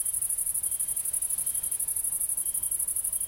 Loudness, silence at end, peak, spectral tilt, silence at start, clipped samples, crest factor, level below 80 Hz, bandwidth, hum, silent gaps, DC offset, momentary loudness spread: -26 LUFS; 0 s; -14 dBFS; 0.5 dB/octave; 0 s; under 0.1%; 16 dB; -58 dBFS; 17 kHz; none; none; under 0.1%; 1 LU